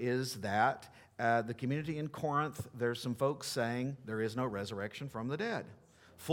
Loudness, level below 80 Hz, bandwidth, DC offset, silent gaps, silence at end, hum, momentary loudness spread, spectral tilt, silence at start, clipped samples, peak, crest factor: -36 LUFS; -70 dBFS; 19 kHz; under 0.1%; none; 0 s; none; 9 LU; -5.5 dB/octave; 0 s; under 0.1%; -16 dBFS; 20 dB